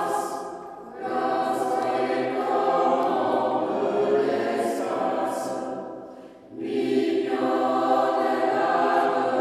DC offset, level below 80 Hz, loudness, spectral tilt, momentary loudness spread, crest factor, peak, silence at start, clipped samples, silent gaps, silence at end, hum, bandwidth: under 0.1%; -72 dBFS; -24 LUFS; -5 dB/octave; 13 LU; 14 dB; -10 dBFS; 0 s; under 0.1%; none; 0 s; none; 14.5 kHz